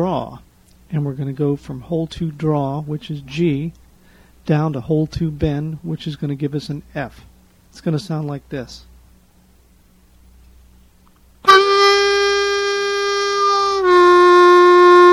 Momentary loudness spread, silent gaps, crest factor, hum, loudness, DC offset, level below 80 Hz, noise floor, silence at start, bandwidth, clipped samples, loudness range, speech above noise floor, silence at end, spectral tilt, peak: 19 LU; none; 16 dB; none; -16 LUFS; under 0.1%; -44 dBFS; -51 dBFS; 0 s; 11.5 kHz; under 0.1%; 16 LU; 30 dB; 0 s; -5.5 dB/octave; 0 dBFS